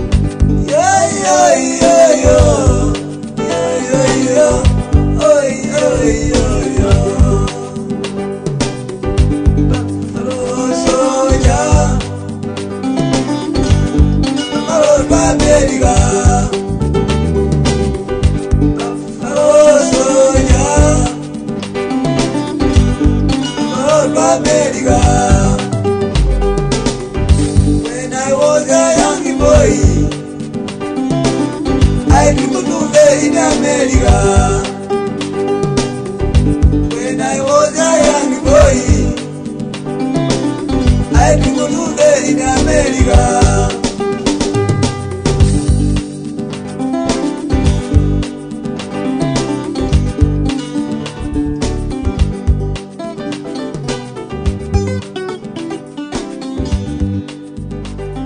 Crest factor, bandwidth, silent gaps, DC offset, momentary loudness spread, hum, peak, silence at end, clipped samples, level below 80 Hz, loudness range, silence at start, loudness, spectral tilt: 12 dB; 10 kHz; none; under 0.1%; 12 LU; none; 0 dBFS; 0 s; under 0.1%; -20 dBFS; 6 LU; 0 s; -13 LUFS; -5.5 dB/octave